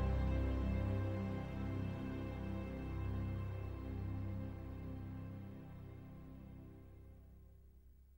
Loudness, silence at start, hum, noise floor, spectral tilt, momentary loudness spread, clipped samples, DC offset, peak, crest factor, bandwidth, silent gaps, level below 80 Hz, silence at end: -44 LUFS; 0 s; none; -62 dBFS; -9 dB/octave; 19 LU; under 0.1%; under 0.1%; -28 dBFS; 16 dB; 16.5 kHz; none; -48 dBFS; 0 s